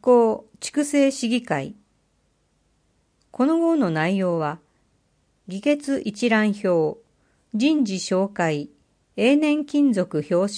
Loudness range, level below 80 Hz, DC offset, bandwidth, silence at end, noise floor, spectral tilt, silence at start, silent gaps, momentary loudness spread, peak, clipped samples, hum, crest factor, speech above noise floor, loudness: 3 LU; -68 dBFS; under 0.1%; 10.5 kHz; 0 s; -66 dBFS; -5.5 dB/octave; 0.05 s; none; 11 LU; -6 dBFS; under 0.1%; none; 16 dB; 46 dB; -22 LUFS